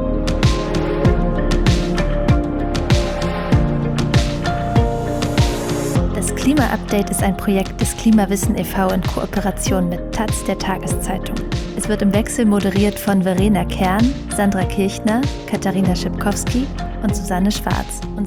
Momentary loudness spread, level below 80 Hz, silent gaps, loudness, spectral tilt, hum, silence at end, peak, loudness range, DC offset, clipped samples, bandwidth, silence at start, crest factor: 6 LU; -26 dBFS; none; -18 LUFS; -5.5 dB/octave; none; 0 s; -2 dBFS; 3 LU; under 0.1%; under 0.1%; over 20 kHz; 0 s; 14 dB